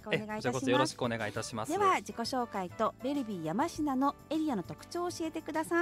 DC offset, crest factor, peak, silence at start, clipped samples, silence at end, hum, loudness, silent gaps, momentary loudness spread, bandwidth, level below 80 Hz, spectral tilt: under 0.1%; 18 dB; -14 dBFS; 0 s; under 0.1%; 0 s; none; -33 LUFS; none; 8 LU; 16 kHz; -64 dBFS; -4.5 dB/octave